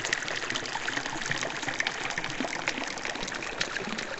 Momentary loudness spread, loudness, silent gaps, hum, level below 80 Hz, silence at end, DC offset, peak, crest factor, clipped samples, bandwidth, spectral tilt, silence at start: 3 LU; -31 LUFS; none; none; -54 dBFS; 0 s; under 0.1%; -6 dBFS; 26 dB; under 0.1%; 16 kHz; -2 dB/octave; 0 s